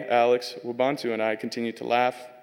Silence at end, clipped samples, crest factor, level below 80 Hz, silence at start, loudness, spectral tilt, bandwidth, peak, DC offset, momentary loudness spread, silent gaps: 0.05 s; under 0.1%; 18 dB; -82 dBFS; 0 s; -26 LUFS; -4.5 dB/octave; 16.5 kHz; -8 dBFS; under 0.1%; 9 LU; none